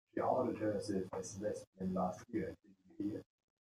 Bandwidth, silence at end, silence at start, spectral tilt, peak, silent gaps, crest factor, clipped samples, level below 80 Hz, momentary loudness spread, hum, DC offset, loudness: 13.5 kHz; 0.4 s; 0.15 s; -6.5 dB/octave; -22 dBFS; 1.67-1.73 s; 18 dB; under 0.1%; -74 dBFS; 9 LU; none; under 0.1%; -41 LUFS